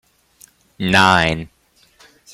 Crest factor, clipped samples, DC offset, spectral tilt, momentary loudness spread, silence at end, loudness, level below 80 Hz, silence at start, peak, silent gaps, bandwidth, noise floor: 20 dB; under 0.1%; under 0.1%; -4.5 dB/octave; 17 LU; 0.9 s; -15 LUFS; -46 dBFS; 0.8 s; 0 dBFS; none; 16 kHz; -55 dBFS